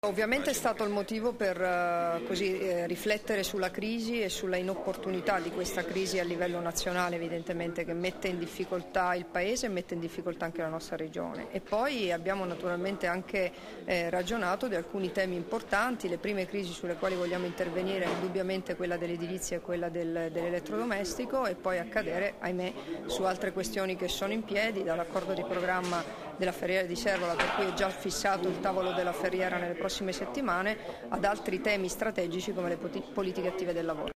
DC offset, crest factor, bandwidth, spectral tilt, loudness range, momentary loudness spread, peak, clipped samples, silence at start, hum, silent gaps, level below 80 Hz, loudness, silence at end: under 0.1%; 18 dB; 15.5 kHz; -4 dB/octave; 3 LU; 6 LU; -14 dBFS; under 0.1%; 0.05 s; none; none; -56 dBFS; -32 LUFS; 0.05 s